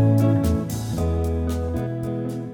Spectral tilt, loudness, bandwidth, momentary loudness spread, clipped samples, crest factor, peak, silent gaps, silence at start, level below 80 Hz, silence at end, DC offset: -8 dB/octave; -23 LUFS; 18.5 kHz; 8 LU; under 0.1%; 14 dB; -8 dBFS; none; 0 s; -36 dBFS; 0 s; under 0.1%